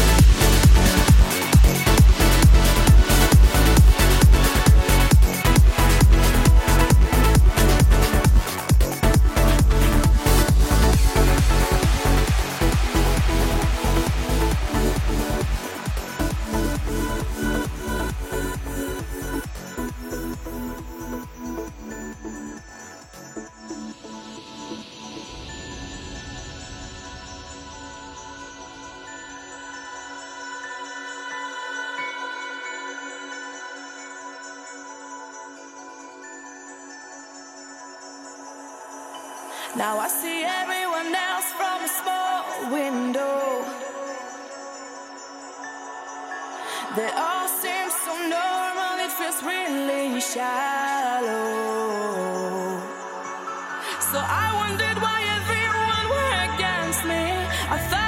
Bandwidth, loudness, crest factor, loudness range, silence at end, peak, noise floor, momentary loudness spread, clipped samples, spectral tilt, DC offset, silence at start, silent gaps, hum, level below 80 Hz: 17 kHz; -21 LUFS; 16 dB; 20 LU; 0 s; -4 dBFS; -41 dBFS; 21 LU; under 0.1%; -4.5 dB/octave; under 0.1%; 0 s; none; none; -24 dBFS